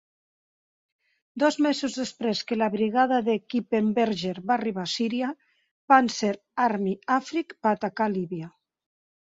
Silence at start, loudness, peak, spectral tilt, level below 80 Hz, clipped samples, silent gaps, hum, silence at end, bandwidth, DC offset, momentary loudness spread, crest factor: 1.35 s; -25 LUFS; -4 dBFS; -5 dB/octave; -70 dBFS; under 0.1%; 5.71-5.88 s; none; 0.8 s; 7.8 kHz; under 0.1%; 9 LU; 22 dB